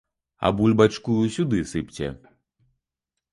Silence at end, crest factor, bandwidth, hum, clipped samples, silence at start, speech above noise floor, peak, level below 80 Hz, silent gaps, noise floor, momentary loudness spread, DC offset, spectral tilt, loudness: 1.2 s; 20 dB; 11.5 kHz; none; under 0.1%; 0.4 s; 63 dB; -4 dBFS; -48 dBFS; none; -85 dBFS; 13 LU; under 0.1%; -6.5 dB/octave; -23 LUFS